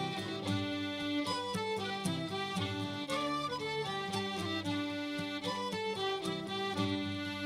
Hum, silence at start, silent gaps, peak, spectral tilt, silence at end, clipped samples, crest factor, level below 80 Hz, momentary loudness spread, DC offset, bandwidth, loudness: none; 0 s; none; -22 dBFS; -4.5 dB/octave; 0 s; under 0.1%; 16 dB; -70 dBFS; 3 LU; under 0.1%; 16 kHz; -36 LUFS